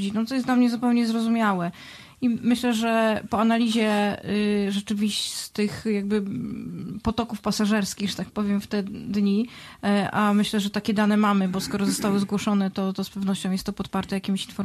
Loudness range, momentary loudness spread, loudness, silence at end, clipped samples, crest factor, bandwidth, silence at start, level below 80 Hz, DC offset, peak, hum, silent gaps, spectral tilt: 3 LU; 8 LU; -24 LUFS; 0 s; under 0.1%; 14 dB; 13.5 kHz; 0 s; -54 dBFS; under 0.1%; -10 dBFS; none; none; -5 dB/octave